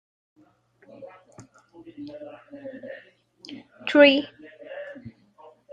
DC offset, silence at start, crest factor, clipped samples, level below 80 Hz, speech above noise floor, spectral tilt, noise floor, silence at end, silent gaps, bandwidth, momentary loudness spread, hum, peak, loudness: under 0.1%; 1 s; 24 dB; under 0.1%; -74 dBFS; 38 dB; -5 dB/octave; -60 dBFS; 0.65 s; none; 7.6 kHz; 30 LU; none; -2 dBFS; -19 LUFS